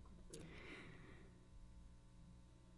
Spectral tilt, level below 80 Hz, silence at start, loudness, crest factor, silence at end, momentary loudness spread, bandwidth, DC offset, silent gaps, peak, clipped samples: -4.5 dB/octave; -64 dBFS; 0 s; -61 LUFS; 20 dB; 0 s; 9 LU; 11 kHz; under 0.1%; none; -40 dBFS; under 0.1%